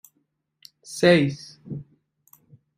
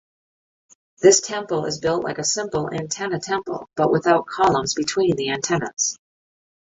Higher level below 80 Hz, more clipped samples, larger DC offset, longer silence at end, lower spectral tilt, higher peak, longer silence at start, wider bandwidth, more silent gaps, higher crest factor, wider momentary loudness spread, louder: second, -62 dBFS vs -56 dBFS; neither; neither; first, 0.95 s vs 0.75 s; first, -5.5 dB/octave vs -3.5 dB/octave; about the same, -4 dBFS vs -2 dBFS; about the same, 0.9 s vs 1 s; first, 15.5 kHz vs 8.2 kHz; second, none vs 5.73-5.77 s; about the same, 22 dB vs 20 dB; first, 20 LU vs 9 LU; about the same, -20 LUFS vs -21 LUFS